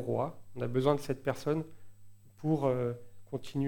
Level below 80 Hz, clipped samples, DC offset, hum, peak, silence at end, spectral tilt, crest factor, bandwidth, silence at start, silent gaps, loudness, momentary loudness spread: -62 dBFS; under 0.1%; under 0.1%; none; -14 dBFS; 0 s; -7.5 dB/octave; 20 dB; 19 kHz; 0 s; none; -34 LUFS; 13 LU